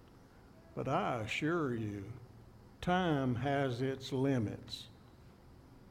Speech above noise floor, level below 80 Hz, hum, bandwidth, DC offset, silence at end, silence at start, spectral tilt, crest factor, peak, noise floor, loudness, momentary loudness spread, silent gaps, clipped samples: 24 dB; -62 dBFS; none; 15 kHz; under 0.1%; 0 s; 0 s; -6.5 dB/octave; 18 dB; -20 dBFS; -59 dBFS; -36 LUFS; 15 LU; none; under 0.1%